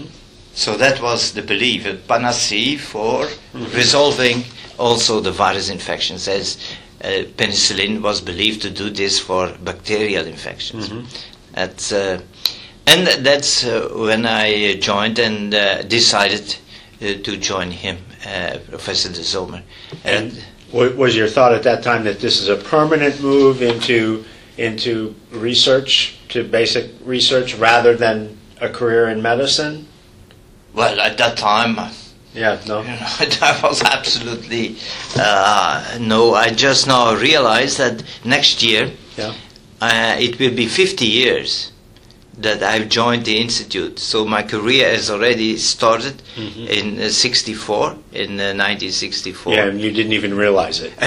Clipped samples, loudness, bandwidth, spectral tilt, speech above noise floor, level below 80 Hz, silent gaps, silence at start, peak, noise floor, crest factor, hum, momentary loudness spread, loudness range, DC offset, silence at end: under 0.1%; -16 LUFS; 17.5 kHz; -3 dB/octave; 28 dB; -48 dBFS; none; 0 s; 0 dBFS; -45 dBFS; 18 dB; none; 14 LU; 5 LU; under 0.1%; 0 s